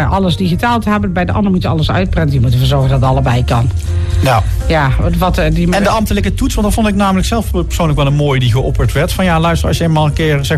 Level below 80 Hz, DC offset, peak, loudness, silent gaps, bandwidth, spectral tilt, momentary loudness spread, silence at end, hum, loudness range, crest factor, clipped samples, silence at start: -20 dBFS; under 0.1%; -2 dBFS; -13 LUFS; none; 14.5 kHz; -6.5 dB/octave; 3 LU; 0 s; none; 1 LU; 10 dB; under 0.1%; 0 s